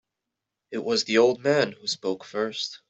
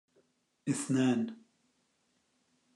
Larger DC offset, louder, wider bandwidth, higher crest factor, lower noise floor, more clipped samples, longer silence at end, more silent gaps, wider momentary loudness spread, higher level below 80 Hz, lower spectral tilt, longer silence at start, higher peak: neither; first, -25 LUFS vs -33 LUFS; second, 8.2 kHz vs 12 kHz; about the same, 20 dB vs 18 dB; first, -85 dBFS vs -76 dBFS; neither; second, 0.15 s vs 1.4 s; neither; about the same, 10 LU vs 11 LU; first, -70 dBFS vs -82 dBFS; second, -3.5 dB/octave vs -5.5 dB/octave; about the same, 0.7 s vs 0.65 s; first, -6 dBFS vs -20 dBFS